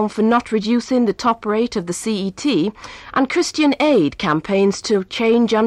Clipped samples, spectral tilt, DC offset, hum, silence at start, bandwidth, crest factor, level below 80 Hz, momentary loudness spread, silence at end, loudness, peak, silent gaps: under 0.1%; -5 dB/octave; under 0.1%; none; 0 s; 12.5 kHz; 12 dB; -52 dBFS; 7 LU; 0 s; -18 LUFS; -6 dBFS; none